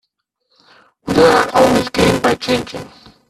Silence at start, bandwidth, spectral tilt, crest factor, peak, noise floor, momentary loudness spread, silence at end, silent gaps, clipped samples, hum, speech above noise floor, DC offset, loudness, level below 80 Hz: 1.05 s; 14 kHz; -4.5 dB/octave; 16 dB; 0 dBFS; -70 dBFS; 18 LU; 0.4 s; none; under 0.1%; none; 57 dB; under 0.1%; -14 LUFS; -42 dBFS